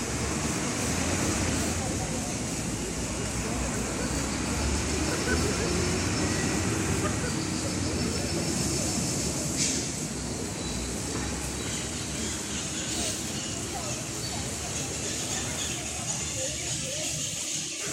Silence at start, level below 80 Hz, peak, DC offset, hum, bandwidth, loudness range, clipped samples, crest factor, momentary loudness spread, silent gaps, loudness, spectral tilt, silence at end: 0 s; -40 dBFS; -14 dBFS; under 0.1%; none; 16 kHz; 3 LU; under 0.1%; 16 dB; 5 LU; none; -29 LUFS; -3.5 dB/octave; 0 s